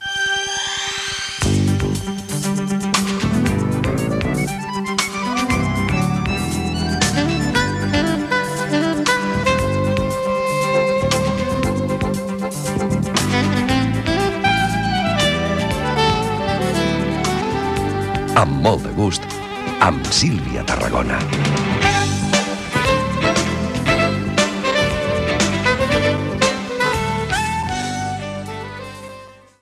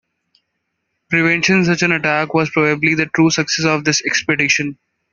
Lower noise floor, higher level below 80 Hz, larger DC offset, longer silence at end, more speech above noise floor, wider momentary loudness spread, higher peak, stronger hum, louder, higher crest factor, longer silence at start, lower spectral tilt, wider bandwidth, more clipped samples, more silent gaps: second, -40 dBFS vs -73 dBFS; first, -34 dBFS vs -56 dBFS; neither; about the same, 0.3 s vs 0.4 s; second, 21 dB vs 57 dB; first, 6 LU vs 3 LU; about the same, 0 dBFS vs -2 dBFS; neither; second, -19 LUFS vs -15 LUFS; about the same, 18 dB vs 16 dB; second, 0 s vs 1.1 s; about the same, -4.5 dB/octave vs -4 dB/octave; first, 15 kHz vs 7.4 kHz; neither; neither